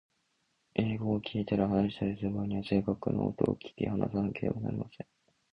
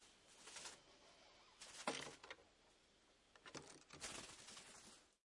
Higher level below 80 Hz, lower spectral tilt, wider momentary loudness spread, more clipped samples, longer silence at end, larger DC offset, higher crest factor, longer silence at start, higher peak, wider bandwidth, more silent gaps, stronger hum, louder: first, -56 dBFS vs -82 dBFS; first, -9.5 dB/octave vs -1.5 dB/octave; second, 8 LU vs 18 LU; neither; first, 0.5 s vs 0.1 s; neither; second, 22 dB vs 30 dB; first, 0.75 s vs 0 s; first, -10 dBFS vs -28 dBFS; second, 5.6 kHz vs 12 kHz; neither; neither; first, -33 LUFS vs -55 LUFS